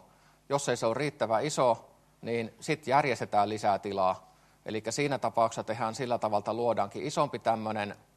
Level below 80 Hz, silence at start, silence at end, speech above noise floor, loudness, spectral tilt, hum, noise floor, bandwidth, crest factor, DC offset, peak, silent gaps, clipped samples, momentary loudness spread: -70 dBFS; 0.5 s; 0.2 s; 31 dB; -30 LUFS; -4.5 dB/octave; none; -61 dBFS; 13 kHz; 20 dB; under 0.1%; -12 dBFS; none; under 0.1%; 8 LU